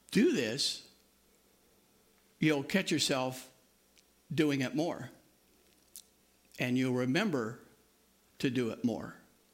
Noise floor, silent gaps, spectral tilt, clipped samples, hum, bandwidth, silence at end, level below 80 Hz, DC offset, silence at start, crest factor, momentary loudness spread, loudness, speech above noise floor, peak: -68 dBFS; none; -4.5 dB/octave; under 0.1%; none; 16.5 kHz; 0.35 s; -74 dBFS; under 0.1%; 0.1 s; 20 dB; 21 LU; -33 LUFS; 36 dB; -16 dBFS